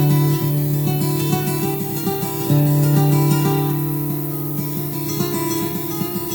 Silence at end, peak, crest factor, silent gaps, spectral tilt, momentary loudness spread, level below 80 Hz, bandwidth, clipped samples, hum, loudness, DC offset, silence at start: 0 s; -4 dBFS; 14 dB; none; -6.5 dB/octave; 7 LU; -52 dBFS; over 20 kHz; under 0.1%; none; -19 LUFS; under 0.1%; 0 s